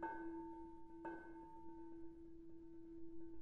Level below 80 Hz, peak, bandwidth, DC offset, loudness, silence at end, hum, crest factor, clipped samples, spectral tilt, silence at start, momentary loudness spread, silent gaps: -68 dBFS; -36 dBFS; 4.3 kHz; under 0.1%; -56 LUFS; 0 s; none; 16 dB; under 0.1%; -6.5 dB/octave; 0 s; 9 LU; none